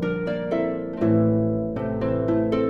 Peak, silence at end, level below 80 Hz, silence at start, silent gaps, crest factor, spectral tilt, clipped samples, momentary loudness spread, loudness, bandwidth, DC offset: -10 dBFS; 0 s; -46 dBFS; 0 s; none; 12 dB; -10 dB/octave; under 0.1%; 6 LU; -24 LUFS; 6 kHz; under 0.1%